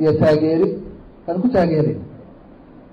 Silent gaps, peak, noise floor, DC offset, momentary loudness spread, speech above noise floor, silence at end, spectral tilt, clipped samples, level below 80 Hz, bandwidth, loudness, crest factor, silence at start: none; -8 dBFS; -43 dBFS; under 0.1%; 19 LU; 26 dB; 0.7 s; -9.5 dB/octave; under 0.1%; -46 dBFS; 7.8 kHz; -18 LUFS; 10 dB; 0 s